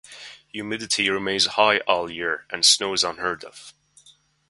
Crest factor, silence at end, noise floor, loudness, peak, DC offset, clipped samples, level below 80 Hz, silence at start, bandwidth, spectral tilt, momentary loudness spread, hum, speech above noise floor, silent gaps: 22 dB; 0.8 s; -57 dBFS; -21 LUFS; -2 dBFS; under 0.1%; under 0.1%; -62 dBFS; 0.1 s; 11.5 kHz; -1 dB/octave; 19 LU; none; 34 dB; none